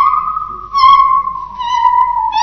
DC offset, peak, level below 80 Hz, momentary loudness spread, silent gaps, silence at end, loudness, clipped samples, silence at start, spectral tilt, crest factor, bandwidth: under 0.1%; 0 dBFS; -42 dBFS; 14 LU; none; 0 s; -12 LUFS; under 0.1%; 0 s; -1.5 dB/octave; 12 dB; 6.4 kHz